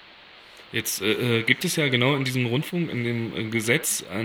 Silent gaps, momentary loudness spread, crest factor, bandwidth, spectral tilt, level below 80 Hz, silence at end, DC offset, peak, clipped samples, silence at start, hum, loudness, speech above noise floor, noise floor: none; 7 LU; 24 dB; 19 kHz; -4 dB/octave; -64 dBFS; 0 s; under 0.1%; -2 dBFS; under 0.1%; 0 s; none; -24 LUFS; 24 dB; -48 dBFS